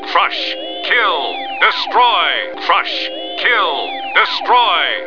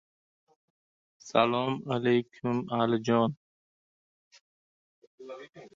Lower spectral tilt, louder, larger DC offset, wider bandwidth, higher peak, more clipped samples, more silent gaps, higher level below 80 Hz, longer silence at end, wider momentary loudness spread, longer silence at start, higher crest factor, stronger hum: second, -1.5 dB/octave vs -6.5 dB/octave; first, -14 LUFS vs -28 LUFS; first, 1% vs under 0.1%; second, 5.4 kHz vs 7.6 kHz; first, 0 dBFS vs -8 dBFS; neither; second, none vs 3.37-4.31 s, 4.41-5.18 s; about the same, -70 dBFS vs -72 dBFS; about the same, 0 s vs 0.1 s; second, 8 LU vs 20 LU; second, 0 s vs 1.25 s; second, 16 dB vs 24 dB; neither